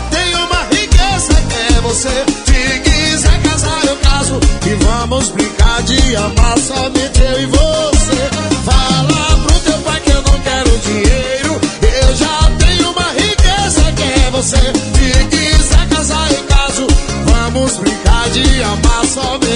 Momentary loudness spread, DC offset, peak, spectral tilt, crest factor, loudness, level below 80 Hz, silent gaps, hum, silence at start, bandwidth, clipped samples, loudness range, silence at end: 3 LU; under 0.1%; 0 dBFS; -4 dB/octave; 10 dB; -12 LUFS; -14 dBFS; none; none; 0 s; 11 kHz; 0.2%; 1 LU; 0 s